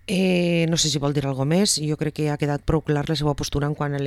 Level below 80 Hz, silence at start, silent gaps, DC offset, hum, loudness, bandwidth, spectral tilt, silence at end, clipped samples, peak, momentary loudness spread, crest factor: -40 dBFS; 0.1 s; none; under 0.1%; none; -22 LUFS; 15 kHz; -5 dB/octave; 0 s; under 0.1%; -6 dBFS; 5 LU; 16 dB